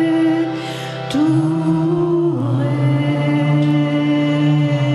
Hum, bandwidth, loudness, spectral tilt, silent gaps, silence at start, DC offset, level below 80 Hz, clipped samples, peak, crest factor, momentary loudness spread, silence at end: none; 11.5 kHz; -17 LUFS; -8 dB/octave; none; 0 s; under 0.1%; -56 dBFS; under 0.1%; -6 dBFS; 10 dB; 5 LU; 0 s